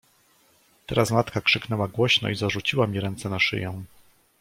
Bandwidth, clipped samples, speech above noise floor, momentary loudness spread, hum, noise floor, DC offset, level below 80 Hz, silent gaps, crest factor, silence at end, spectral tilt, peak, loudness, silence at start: 16.5 kHz; under 0.1%; 37 dB; 9 LU; none; -61 dBFS; under 0.1%; -56 dBFS; none; 20 dB; 0.55 s; -4.5 dB/octave; -6 dBFS; -24 LUFS; 0.9 s